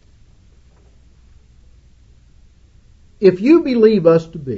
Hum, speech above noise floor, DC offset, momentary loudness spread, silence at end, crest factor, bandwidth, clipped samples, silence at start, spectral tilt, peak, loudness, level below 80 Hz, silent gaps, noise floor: none; 36 dB; under 0.1%; 4 LU; 0 s; 18 dB; 7.4 kHz; under 0.1%; 3.2 s; -8.5 dB/octave; 0 dBFS; -13 LUFS; -48 dBFS; none; -48 dBFS